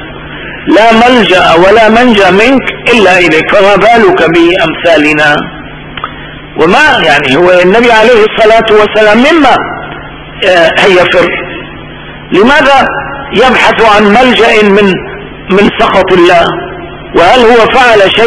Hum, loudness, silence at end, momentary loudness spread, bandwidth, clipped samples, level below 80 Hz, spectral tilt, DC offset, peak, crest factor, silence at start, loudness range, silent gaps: none; -4 LUFS; 0 s; 17 LU; 11 kHz; 10%; -30 dBFS; -5 dB/octave; 2%; 0 dBFS; 6 dB; 0 s; 3 LU; none